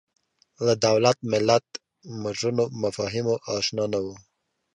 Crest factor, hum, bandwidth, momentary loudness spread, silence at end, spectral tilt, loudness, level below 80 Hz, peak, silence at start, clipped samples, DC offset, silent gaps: 22 dB; none; 11 kHz; 14 LU; 0.55 s; -4.5 dB/octave; -24 LUFS; -60 dBFS; -4 dBFS; 0.6 s; under 0.1%; under 0.1%; none